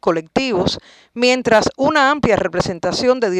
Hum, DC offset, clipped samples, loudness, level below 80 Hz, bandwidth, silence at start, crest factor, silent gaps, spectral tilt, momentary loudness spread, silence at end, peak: none; under 0.1%; under 0.1%; -16 LUFS; -44 dBFS; 11.5 kHz; 0.05 s; 14 dB; none; -4.5 dB/octave; 6 LU; 0 s; -2 dBFS